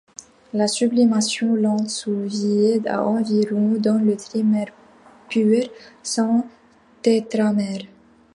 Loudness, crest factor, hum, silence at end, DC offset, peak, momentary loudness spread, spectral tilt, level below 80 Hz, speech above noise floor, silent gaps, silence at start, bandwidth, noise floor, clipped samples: -20 LUFS; 16 dB; none; 0.5 s; under 0.1%; -4 dBFS; 11 LU; -5 dB/octave; -68 dBFS; 29 dB; none; 0.55 s; 11.5 kHz; -49 dBFS; under 0.1%